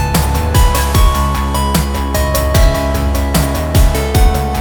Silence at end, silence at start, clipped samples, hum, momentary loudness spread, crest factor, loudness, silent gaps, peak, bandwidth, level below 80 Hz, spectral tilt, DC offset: 0 s; 0 s; under 0.1%; none; 3 LU; 12 dB; -14 LUFS; none; 0 dBFS; over 20 kHz; -14 dBFS; -5 dB/octave; under 0.1%